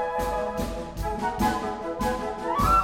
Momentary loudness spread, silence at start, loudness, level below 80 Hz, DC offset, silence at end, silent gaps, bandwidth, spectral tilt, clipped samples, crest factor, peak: 6 LU; 0 s; -28 LUFS; -36 dBFS; under 0.1%; 0 s; none; 17 kHz; -5.5 dB/octave; under 0.1%; 16 dB; -10 dBFS